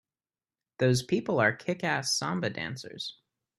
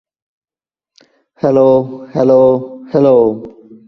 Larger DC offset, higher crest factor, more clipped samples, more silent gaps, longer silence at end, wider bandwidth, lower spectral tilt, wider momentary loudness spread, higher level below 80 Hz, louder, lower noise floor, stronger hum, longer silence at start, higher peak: neither; first, 20 dB vs 14 dB; neither; neither; about the same, 0.45 s vs 0.4 s; first, 13.5 kHz vs 6 kHz; second, -4.5 dB/octave vs -9.5 dB/octave; first, 12 LU vs 9 LU; second, -64 dBFS vs -52 dBFS; second, -29 LUFS vs -12 LUFS; about the same, under -90 dBFS vs under -90 dBFS; neither; second, 0.8 s vs 1.45 s; second, -10 dBFS vs 0 dBFS